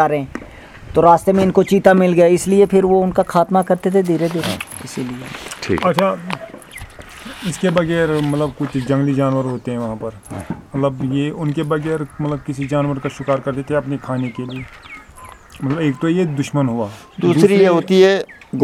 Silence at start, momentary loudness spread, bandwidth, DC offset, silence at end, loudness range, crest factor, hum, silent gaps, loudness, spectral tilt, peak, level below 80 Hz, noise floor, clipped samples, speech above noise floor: 0 s; 17 LU; 15.5 kHz; under 0.1%; 0 s; 8 LU; 16 dB; none; none; -17 LUFS; -6.5 dB/octave; 0 dBFS; -46 dBFS; -39 dBFS; under 0.1%; 23 dB